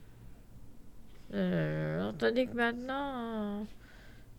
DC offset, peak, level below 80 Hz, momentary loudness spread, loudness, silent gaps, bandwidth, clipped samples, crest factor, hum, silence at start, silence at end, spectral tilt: under 0.1%; -16 dBFS; -56 dBFS; 17 LU; -34 LUFS; none; 17 kHz; under 0.1%; 18 dB; none; 0 s; 0 s; -7.5 dB/octave